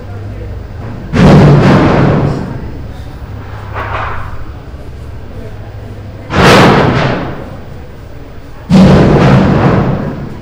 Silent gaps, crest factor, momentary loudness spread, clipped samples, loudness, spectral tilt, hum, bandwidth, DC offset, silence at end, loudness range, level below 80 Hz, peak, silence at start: none; 10 dB; 23 LU; 2%; -8 LUFS; -7 dB/octave; none; 16.5 kHz; under 0.1%; 0 s; 14 LU; -24 dBFS; 0 dBFS; 0 s